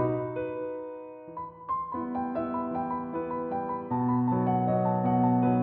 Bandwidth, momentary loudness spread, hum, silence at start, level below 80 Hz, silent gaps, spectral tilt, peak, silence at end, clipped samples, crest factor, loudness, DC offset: 3.7 kHz; 15 LU; none; 0 s; -62 dBFS; none; -13 dB/octave; -14 dBFS; 0 s; under 0.1%; 14 dB; -29 LUFS; under 0.1%